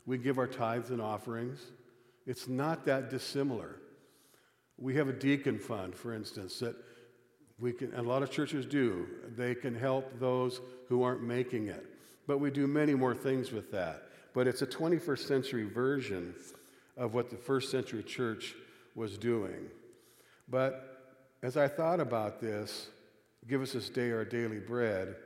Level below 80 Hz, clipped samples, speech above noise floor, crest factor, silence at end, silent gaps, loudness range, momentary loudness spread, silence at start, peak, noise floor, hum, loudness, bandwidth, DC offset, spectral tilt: -80 dBFS; under 0.1%; 34 dB; 18 dB; 0 s; none; 5 LU; 13 LU; 0.05 s; -16 dBFS; -68 dBFS; none; -35 LUFS; 16 kHz; under 0.1%; -6 dB/octave